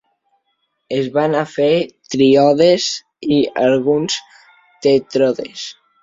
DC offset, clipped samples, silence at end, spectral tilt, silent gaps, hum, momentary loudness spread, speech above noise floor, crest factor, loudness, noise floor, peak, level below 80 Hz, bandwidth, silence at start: under 0.1%; under 0.1%; 0.3 s; -5 dB/octave; none; none; 12 LU; 54 dB; 16 dB; -16 LUFS; -69 dBFS; -2 dBFS; -58 dBFS; 7.8 kHz; 0.9 s